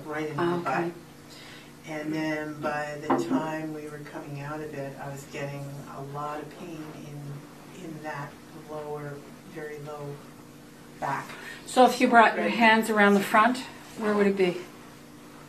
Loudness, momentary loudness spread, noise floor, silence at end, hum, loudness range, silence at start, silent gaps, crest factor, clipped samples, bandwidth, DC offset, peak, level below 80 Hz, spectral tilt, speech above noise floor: -26 LUFS; 24 LU; -48 dBFS; 0 s; none; 17 LU; 0 s; none; 24 dB; under 0.1%; 14 kHz; under 0.1%; -4 dBFS; -66 dBFS; -5 dB/octave; 21 dB